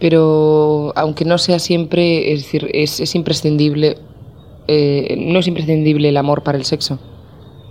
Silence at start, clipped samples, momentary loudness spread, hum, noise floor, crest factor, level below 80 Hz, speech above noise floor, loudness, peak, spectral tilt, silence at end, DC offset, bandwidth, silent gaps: 0 s; under 0.1%; 7 LU; none; -38 dBFS; 14 dB; -48 dBFS; 24 dB; -15 LUFS; 0 dBFS; -6 dB/octave; 0 s; 0.2%; 15.5 kHz; none